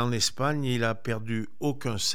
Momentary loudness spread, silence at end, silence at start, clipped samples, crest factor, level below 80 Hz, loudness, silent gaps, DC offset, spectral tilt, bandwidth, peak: 6 LU; 0 s; 0 s; under 0.1%; 16 dB; -58 dBFS; -29 LUFS; none; 2%; -4 dB/octave; 16.5 kHz; -12 dBFS